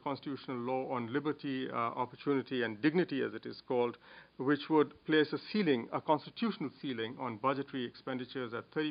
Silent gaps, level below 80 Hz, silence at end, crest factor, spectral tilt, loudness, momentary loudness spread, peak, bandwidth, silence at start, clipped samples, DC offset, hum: none; -78 dBFS; 0 s; 20 dB; -4 dB/octave; -35 LUFS; 9 LU; -16 dBFS; 5.2 kHz; 0.05 s; under 0.1%; under 0.1%; none